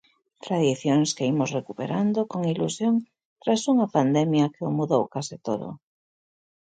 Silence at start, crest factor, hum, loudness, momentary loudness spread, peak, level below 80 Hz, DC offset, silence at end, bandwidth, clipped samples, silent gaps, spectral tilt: 0.45 s; 18 dB; none; -25 LUFS; 9 LU; -8 dBFS; -70 dBFS; under 0.1%; 0.9 s; 9.4 kHz; under 0.1%; 3.25-3.36 s; -6 dB/octave